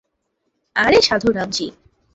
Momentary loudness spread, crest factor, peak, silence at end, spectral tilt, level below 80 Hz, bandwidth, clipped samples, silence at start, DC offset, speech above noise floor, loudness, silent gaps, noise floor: 11 LU; 18 dB; -2 dBFS; 0.45 s; -3.5 dB/octave; -48 dBFS; 8 kHz; under 0.1%; 0.75 s; under 0.1%; 55 dB; -17 LUFS; none; -72 dBFS